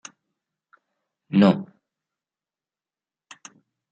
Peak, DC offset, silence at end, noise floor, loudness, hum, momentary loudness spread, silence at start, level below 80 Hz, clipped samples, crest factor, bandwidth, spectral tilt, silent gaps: -4 dBFS; under 0.1%; 2.25 s; under -90 dBFS; -20 LUFS; none; 27 LU; 1.3 s; -70 dBFS; under 0.1%; 24 dB; 7.8 kHz; -7 dB/octave; none